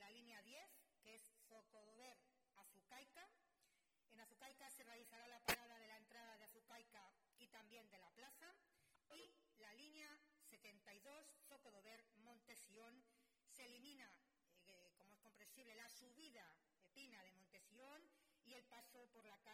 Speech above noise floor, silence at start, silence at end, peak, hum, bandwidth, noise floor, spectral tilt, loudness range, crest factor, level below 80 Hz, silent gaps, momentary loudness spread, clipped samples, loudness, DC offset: 20 dB; 0 s; 0 s; -28 dBFS; none; 16 kHz; -85 dBFS; -1.5 dB/octave; 12 LU; 34 dB; -88 dBFS; none; 7 LU; under 0.1%; -60 LUFS; under 0.1%